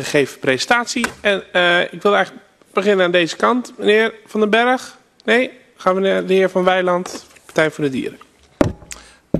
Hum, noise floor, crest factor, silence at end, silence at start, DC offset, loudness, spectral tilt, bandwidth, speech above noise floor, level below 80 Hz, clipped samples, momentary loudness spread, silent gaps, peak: none; -39 dBFS; 18 dB; 0 s; 0 s; under 0.1%; -17 LUFS; -4.5 dB/octave; 13 kHz; 22 dB; -48 dBFS; under 0.1%; 11 LU; none; 0 dBFS